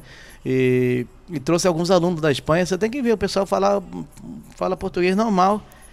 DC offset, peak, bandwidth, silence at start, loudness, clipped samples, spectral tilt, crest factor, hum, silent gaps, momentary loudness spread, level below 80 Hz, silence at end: under 0.1%; -4 dBFS; 15 kHz; 0.1 s; -20 LUFS; under 0.1%; -5.5 dB/octave; 16 dB; none; none; 14 LU; -46 dBFS; 0.25 s